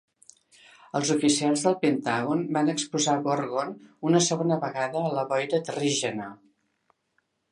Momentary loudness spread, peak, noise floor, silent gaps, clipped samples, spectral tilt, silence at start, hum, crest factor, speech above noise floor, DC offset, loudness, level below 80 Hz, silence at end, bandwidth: 9 LU; -8 dBFS; -74 dBFS; none; under 0.1%; -4 dB/octave; 0.95 s; none; 18 dB; 48 dB; under 0.1%; -26 LUFS; -74 dBFS; 1.15 s; 11.5 kHz